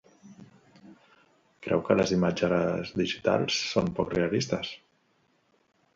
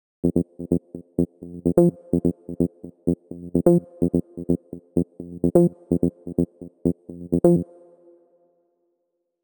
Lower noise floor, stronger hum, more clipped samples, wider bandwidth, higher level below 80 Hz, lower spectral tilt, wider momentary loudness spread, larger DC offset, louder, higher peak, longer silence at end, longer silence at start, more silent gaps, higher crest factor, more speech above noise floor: second, -69 dBFS vs -76 dBFS; neither; neither; second, 7.8 kHz vs 19.5 kHz; second, -56 dBFS vs -48 dBFS; second, -5 dB/octave vs -11 dB/octave; about the same, 8 LU vs 9 LU; neither; second, -27 LUFS vs -24 LUFS; second, -8 dBFS vs -2 dBFS; second, 1.2 s vs 1.8 s; about the same, 0.25 s vs 0.25 s; neither; about the same, 22 dB vs 22 dB; second, 42 dB vs 56 dB